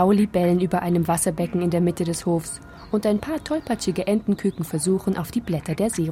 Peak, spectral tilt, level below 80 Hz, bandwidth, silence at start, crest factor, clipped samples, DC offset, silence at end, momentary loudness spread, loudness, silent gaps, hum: -8 dBFS; -6 dB/octave; -48 dBFS; 16 kHz; 0 s; 14 dB; under 0.1%; under 0.1%; 0 s; 6 LU; -23 LUFS; none; none